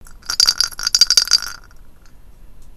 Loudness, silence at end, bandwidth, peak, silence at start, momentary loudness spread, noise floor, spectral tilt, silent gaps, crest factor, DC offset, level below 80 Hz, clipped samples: -13 LUFS; 0 s; over 20 kHz; 0 dBFS; 0 s; 10 LU; -40 dBFS; 2.5 dB/octave; none; 20 dB; under 0.1%; -42 dBFS; 0.1%